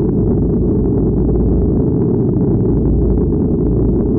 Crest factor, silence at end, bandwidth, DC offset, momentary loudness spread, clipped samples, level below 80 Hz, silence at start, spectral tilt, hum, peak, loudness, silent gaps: 8 dB; 0 s; 1.9 kHz; under 0.1%; 1 LU; under 0.1%; -20 dBFS; 0 s; -17.5 dB/octave; none; -6 dBFS; -15 LUFS; none